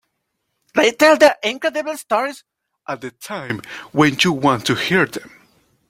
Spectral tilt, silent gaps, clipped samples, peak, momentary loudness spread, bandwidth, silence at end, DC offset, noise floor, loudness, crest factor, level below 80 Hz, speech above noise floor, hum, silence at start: -4.5 dB/octave; none; under 0.1%; -2 dBFS; 17 LU; 16.5 kHz; 0.6 s; under 0.1%; -73 dBFS; -17 LUFS; 18 dB; -58 dBFS; 56 dB; none; 0.75 s